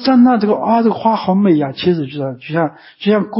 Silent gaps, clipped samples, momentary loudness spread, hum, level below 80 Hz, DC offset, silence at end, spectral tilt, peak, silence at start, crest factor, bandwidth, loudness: none; under 0.1%; 10 LU; none; -56 dBFS; under 0.1%; 0 s; -11.5 dB/octave; -2 dBFS; 0 s; 12 dB; 5.8 kHz; -15 LUFS